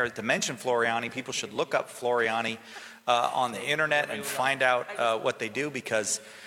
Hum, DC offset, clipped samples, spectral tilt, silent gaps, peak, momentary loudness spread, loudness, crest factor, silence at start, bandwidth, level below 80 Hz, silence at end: none; under 0.1%; under 0.1%; -2.5 dB/octave; none; -8 dBFS; 7 LU; -28 LUFS; 20 dB; 0 s; 17 kHz; -76 dBFS; 0 s